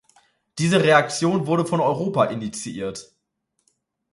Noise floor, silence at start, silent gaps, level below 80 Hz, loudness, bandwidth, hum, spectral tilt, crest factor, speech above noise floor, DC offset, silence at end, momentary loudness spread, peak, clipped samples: -74 dBFS; 0.55 s; none; -62 dBFS; -21 LUFS; 11.5 kHz; none; -5 dB/octave; 20 dB; 54 dB; under 0.1%; 1.1 s; 15 LU; -2 dBFS; under 0.1%